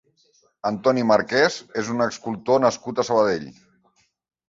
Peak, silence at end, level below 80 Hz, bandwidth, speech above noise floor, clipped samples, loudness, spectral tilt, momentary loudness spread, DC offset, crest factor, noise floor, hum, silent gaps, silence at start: -4 dBFS; 1 s; -62 dBFS; 7.8 kHz; 43 dB; under 0.1%; -22 LUFS; -4.5 dB/octave; 11 LU; under 0.1%; 20 dB; -65 dBFS; none; none; 0.65 s